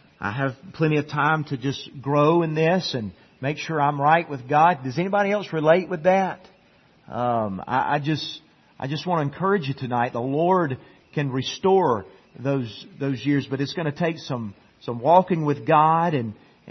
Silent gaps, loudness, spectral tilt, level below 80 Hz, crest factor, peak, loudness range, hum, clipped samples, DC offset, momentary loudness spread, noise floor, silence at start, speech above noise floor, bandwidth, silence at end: none; -23 LUFS; -7 dB/octave; -64 dBFS; 20 dB; -2 dBFS; 4 LU; none; under 0.1%; under 0.1%; 12 LU; -57 dBFS; 0.2 s; 35 dB; 6.4 kHz; 0 s